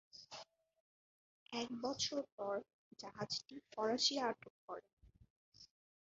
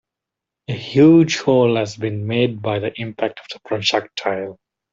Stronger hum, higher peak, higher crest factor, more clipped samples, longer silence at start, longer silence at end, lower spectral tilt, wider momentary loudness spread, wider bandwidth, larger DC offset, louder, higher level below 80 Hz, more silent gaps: neither; second, -22 dBFS vs -2 dBFS; first, 22 dB vs 16 dB; neither; second, 0.15 s vs 0.7 s; about the same, 0.35 s vs 0.4 s; second, -1.5 dB/octave vs -6 dB/octave; first, 19 LU vs 16 LU; about the same, 7.6 kHz vs 7.6 kHz; neither; second, -41 LUFS vs -18 LUFS; second, -80 dBFS vs -60 dBFS; first, 0.80-1.46 s, 2.32-2.38 s, 2.74-2.91 s, 4.50-4.68 s, 4.93-4.97 s, 5.30-5.52 s vs none